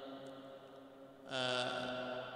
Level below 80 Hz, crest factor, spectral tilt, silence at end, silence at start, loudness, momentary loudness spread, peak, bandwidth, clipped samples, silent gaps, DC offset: -80 dBFS; 22 dB; -3.5 dB/octave; 0 s; 0 s; -40 LUFS; 19 LU; -22 dBFS; 15.5 kHz; under 0.1%; none; under 0.1%